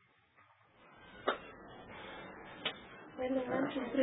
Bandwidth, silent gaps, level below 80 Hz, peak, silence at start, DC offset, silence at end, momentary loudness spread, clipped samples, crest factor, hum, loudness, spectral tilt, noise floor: 3.9 kHz; none; -70 dBFS; -18 dBFS; 0.4 s; under 0.1%; 0 s; 17 LU; under 0.1%; 22 dB; none; -40 LUFS; -1.5 dB/octave; -68 dBFS